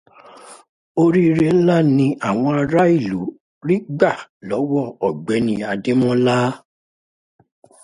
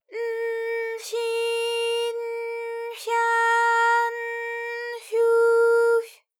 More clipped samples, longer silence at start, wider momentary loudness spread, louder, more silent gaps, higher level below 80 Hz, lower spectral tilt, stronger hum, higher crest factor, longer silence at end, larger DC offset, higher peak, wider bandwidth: neither; first, 0.45 s vs 0.1 s; about the same, 11 LU vs 12 LU; first, -18 LUFS vs -23 LUFS; first, 0.69-0.95 s, 3.40-3.61 s, 4.29-4.40 s vs none; first, -56 dBFS vs under -90 dBFS; first, -7.5 dB/octave vs 3 dB/octave; neither; first, 18 dB vs 12 dB; first, 1.25 s vs 0.25 s; neither; first, 0 dBFS vs -12 dBFS; second, 11.5 kHz vs 16 kHz